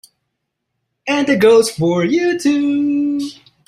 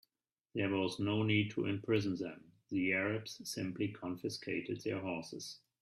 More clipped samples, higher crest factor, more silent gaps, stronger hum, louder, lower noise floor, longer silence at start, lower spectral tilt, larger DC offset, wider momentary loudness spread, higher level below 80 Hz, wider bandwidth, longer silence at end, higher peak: neither; about the same, 14 dB vs 18 dB; neither; neither; first, -15 LUFS vs -37 LUFS; second, -75 dBFS vs under -90 dBFS; first, 1.05 s vs 0.55 s; about the same, -5 dB/octave vs -5.5 dB/octave; neither; about the same, 11 LU vs 11 LU; first, -58 dBFS vs -74 dBFS; about the same, 14.5 kHz vs 14 kHz; about the same, 0.35 s vs 0.25 s; first, -2 dBFS vs -20 dBFS